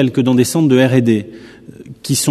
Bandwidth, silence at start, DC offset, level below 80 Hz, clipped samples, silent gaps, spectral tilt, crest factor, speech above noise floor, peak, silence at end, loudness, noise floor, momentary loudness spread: 13.5 kHz; 0 s; under 0.1%; -54 dBFS; under 0.1%; none; -5.5 dB/octave; 14 dB; 23 dB; 0 dBFS; 0 s; -13 LUFS; -36 dBFS; 13 LU